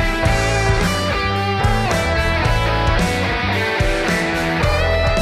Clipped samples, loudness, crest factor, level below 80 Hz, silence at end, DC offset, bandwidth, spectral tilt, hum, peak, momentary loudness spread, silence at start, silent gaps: under 0.1%; -17 LUFS; 12 dB; -24 dBFS; 0 s; under 0.1%; 15.5 kHz; -5 dB/octave; none; -4 dBFS; 2 LU; 0 s; none